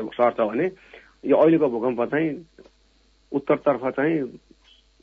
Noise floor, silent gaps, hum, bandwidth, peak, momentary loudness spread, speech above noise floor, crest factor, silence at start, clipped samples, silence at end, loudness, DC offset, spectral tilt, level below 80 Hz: -60 dBFS; none; none; 5.2 kHz; -6 dBFS; 12 LU; 38 dB; 18 dB; 0 s; under 0.1%; 0.65 s; -22 LUFS; under 0.1%; -9 dB/octave; -62 dBFS